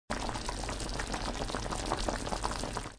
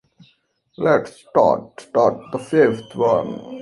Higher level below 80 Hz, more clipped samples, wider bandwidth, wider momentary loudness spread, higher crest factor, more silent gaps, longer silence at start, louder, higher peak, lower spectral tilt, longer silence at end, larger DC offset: first, -42 dBFS vs -60 dBFS; neither; about the same, 10.5 kHz vs 11.5 kHz; second, 3 LU vs 7 LU; about the same, 20 dB vs 18 dB; neither; second, 0.1 s vs 0.8 s; second, -36 LUFS vs -19 LUFS; second, -16 dBFS vs -2 dBFS; second, -3.5 dB/octave vs -7 dB/octave; about the same, 0 s vs 0 s; neither